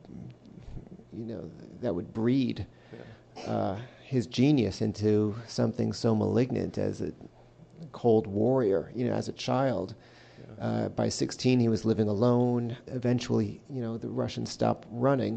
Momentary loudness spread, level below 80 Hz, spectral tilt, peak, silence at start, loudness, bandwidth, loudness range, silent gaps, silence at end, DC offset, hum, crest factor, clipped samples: 21 LU; -58 dBFS; -7 dB/octave; -12 dBFS; 0.05 s; -29 LUFS; 8.8 kHz; 5 LU; none; 0 s; under 0.1%; none; 18 dB; under 0.1%